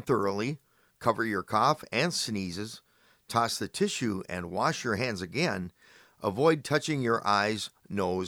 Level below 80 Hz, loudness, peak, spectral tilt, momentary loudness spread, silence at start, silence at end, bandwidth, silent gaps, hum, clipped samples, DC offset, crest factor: -64 dBFS; -29 LUFS; -10 dBFS; -4.5 dB/octave; 9 LU; 0 s; 0 s; over 20 kHz; none; none; under 0.1%; under 0.1%; 20 dB